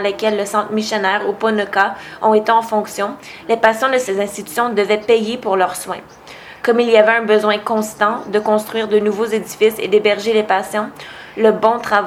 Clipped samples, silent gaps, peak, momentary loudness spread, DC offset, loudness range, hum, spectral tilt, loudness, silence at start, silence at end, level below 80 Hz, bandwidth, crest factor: under 0.1%; none; 0 dBFS; 9 LU; under 0.1%; 2 LU; none; -4 dB/octave; -16 LUFS; 0 s; 0 s; -58 dBFS; 16 kHz; 16 dB